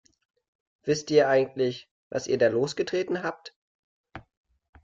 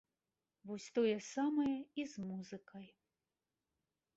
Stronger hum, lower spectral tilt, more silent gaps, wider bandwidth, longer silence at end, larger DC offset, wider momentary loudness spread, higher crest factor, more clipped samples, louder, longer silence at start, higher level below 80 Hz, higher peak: neither; about the same, -5 dB/octave vs -5 dB/octave; first, 1.91-2.11 s, 3.56-4.04 s vs none; about the same, 7.8 kHz vs 8 kHz; second, 0.65 s vs 1.3 s; neither; second, 14 LU vs 19 LU; about the same, 20 dB vs 18 dB; neither; first, -26 LUFS vs -40 LUFS; first, 0.85 s vs 0.65 s; first, -66 dBFS vs -80 dBFS; first, -8 dBFS vs -24 dBFS